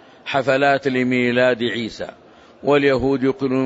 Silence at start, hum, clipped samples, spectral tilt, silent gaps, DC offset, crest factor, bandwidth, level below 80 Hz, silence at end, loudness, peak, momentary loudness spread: 0.25 s; none; under 0.1%; -6 dB/octave; none; under 0.1%; 14 dB; 8 kHz; -50 dBFS; 0 s; -19 LUFS; -4 dBFS; 10 LU